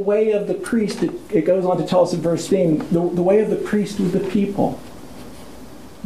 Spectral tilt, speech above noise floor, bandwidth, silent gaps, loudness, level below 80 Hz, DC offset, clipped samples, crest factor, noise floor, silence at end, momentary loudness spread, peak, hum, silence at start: -7 dB/octave; 21 dB; 15 kHz; none; -19 LUFS; -50 dBFS; 0.5%; under 0.1%; 14 dB; -40 dBFS; 0 s; 21 LU; -4 dBFS; none; 0 s